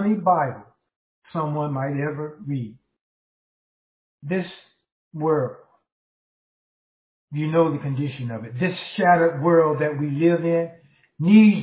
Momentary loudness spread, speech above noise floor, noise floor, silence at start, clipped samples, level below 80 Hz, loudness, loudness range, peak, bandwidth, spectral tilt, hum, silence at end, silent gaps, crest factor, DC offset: 15 LU; over 69 dB; under -90 dBFS; 0 s; under 0.1%; -68 dBFS; -22 LUFS; 9 LU; -4 dBFS; 4 kHz; -11.5 dB/octave; none; 0 s; 0.96-1.22 s, 3.01-4.18 s, 4.92-5.11 s, 5.92-7.28 s; 18 dB; under 0.1%